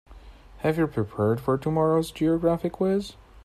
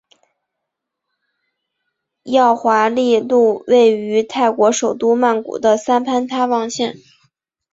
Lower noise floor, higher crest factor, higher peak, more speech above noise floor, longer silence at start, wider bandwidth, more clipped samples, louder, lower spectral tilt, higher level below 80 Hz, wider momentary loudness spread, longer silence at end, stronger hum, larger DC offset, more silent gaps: second, -47 dBFS vs -79 dBFS; about the same, 16 dB vs 16 dB; second, -10 dBFS vs -2 dBFS; second, 22 dB vs 64 dB; second, 0.1 s vs 2.25 s; first, 14 kHz vs 7.8 kHz; neither; second, -25 LUFS vs -15 LUFS; first, -7.5 dB/octave vs -3.5 dB/octave; first, -50 dBFS vs -64 dBFS; about the same, 5 LU vs 6 LU; second, 0.3 s vs 0.8 s; neither; neither; neither